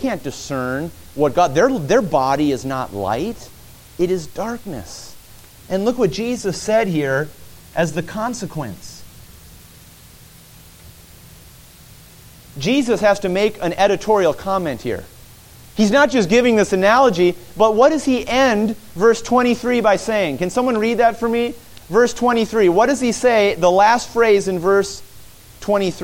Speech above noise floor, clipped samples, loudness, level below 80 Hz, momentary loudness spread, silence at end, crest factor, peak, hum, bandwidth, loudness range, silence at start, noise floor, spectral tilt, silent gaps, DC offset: 27 dB; under 0.1%; -17 LUFS; -46 dBFS; 14 LU; 0 s; 16 dB; -2 dBFS; none; 17 kHz; 10 LU; 0 s; -43 dBFS; -5 dB/octave; none; under 0.1%